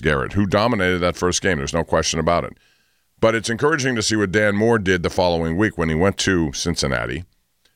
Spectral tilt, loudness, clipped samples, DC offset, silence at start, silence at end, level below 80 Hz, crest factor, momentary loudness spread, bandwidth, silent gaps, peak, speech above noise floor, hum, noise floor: -4.5 dB/octave; -19 LUFS; under 0.1%; under 0.1%; 0 s; 0.5 s; -38 dBFS; 14 dB; 4 LU; 16 kHz; none; -6 dBFS; 43 dB; none; -62 dBFS